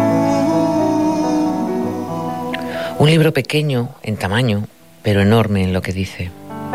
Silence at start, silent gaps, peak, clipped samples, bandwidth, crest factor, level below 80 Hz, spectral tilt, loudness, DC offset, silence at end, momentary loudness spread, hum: 0 s; none; -4 dBFS; under 0.1%; 16 kHz; 14 dB; -50 dBFS; -6.5 dB/octave; -17 LUFS; 0.5%; 0 s; 10 LU; none